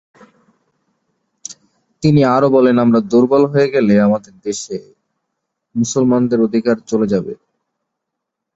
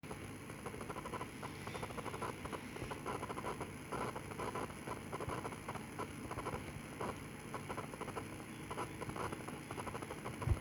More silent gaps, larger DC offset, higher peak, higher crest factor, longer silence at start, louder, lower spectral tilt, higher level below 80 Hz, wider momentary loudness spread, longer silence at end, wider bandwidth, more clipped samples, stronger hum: neither; neither; first, -2 dBFS vs -24 dBFS; second, 14 dB vs 22 dB; first, 1.5 s vs 0.05 s; first, -14 LUFS vs -45 LUFS; first, -6.5 dB/octave vs -5 dB/octave; about the same, -54 dBFS vs -58 dBFS; first, 18 LU vs 4 LU; first, 1.2 s vs 0 s; second, 8 kHz vs over 20 kHz; neither; neither